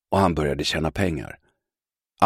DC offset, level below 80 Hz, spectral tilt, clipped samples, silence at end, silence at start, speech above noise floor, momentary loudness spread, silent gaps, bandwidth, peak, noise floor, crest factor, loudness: under 0.1%; -42 dBFS; -5.5 dB/octave; under 0.1%; 0 s; 0.1 s; over 67 dB; 11 LU; none; 15.5 kHz; -2 dBFS; under -90 dBFS; 22 dB; -24 LUFS